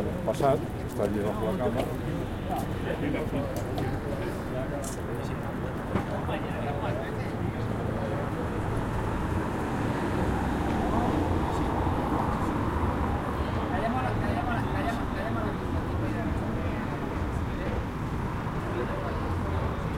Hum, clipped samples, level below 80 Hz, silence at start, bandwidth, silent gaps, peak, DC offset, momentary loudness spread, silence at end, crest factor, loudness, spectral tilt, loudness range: none; under 0.1%; -38 dBFS; 0 s; 16.5 kHz; none; -12 dBFS; under 0.1%; 5 LU; 0 s; 18 dB; -30 LUFS; -7 dB/octave; 4 LU